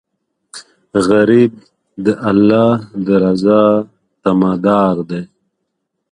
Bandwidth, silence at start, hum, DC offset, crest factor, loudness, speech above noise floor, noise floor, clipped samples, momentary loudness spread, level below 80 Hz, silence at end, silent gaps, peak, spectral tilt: 11 kHz; 0.55 s; none; under 0.1%; 14 dB; -13 LUFS; 60 dB; -72 dBFS; under 0.1%; 14 LU; -50 dBFS; 0.85 s; none; 0 dBFS; -7.5 dB/octave